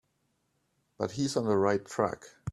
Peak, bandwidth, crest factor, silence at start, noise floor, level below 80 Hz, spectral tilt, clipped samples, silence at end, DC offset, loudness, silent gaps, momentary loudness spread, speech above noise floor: -12 dBFS; 12.5 kHz; 22 dB; 1 s; -76 dBFS; -64 dBFS; -5.5 dB/octave; under 0.1%; 0 s; under 0.1%; -30 LUFS; none; 10 LU; 47 dB